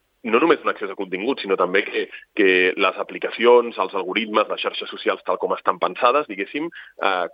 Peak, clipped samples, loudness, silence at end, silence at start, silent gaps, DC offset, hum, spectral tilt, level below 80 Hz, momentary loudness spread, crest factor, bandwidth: 0 dBFS; under 0.1%; -21 LUFS; 0.05 s; 0.25 s; none; under 0.1%; none; -7 dB/octave; -76 dBFS; 11 LU; 20 dB; 5.2 kHz